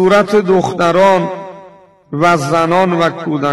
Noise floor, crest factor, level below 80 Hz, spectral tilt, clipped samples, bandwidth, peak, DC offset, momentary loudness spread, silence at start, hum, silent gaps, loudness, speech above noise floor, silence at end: -41 dBFS; 10 dB; -50 dBFS; -6 dB/octave; under 0.1%; 13.5 kHz; -4 dBFS; 0.5%; 13 LU; 0 s; none; none; -12 LUFS; 29 dB; 0 s